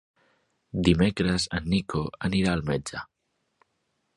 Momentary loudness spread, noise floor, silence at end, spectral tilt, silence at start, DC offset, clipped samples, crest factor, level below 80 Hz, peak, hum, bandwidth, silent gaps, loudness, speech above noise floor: 14 LU; -76 dBFS; 1.15 s; -5.5 dB/octave; 0.75 s; under 0.1%; under 0.1%; 22 dB; -44 dBFS; -6 dBFS; none; 11.5 kHz; none; -26 LUFS; 51 dB